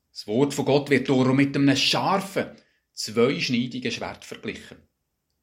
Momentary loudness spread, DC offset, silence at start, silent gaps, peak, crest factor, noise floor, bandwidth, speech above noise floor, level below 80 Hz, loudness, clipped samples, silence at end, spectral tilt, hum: 15 LU; under 0.1%; 0.15 s; none; -6 dBFS; 20 dB; -77 dBFS; 16 kHz; 53 dB; -62 dBFS; -23 LUFS; under 0.1%; 0.7 s; -5 dB/octave; none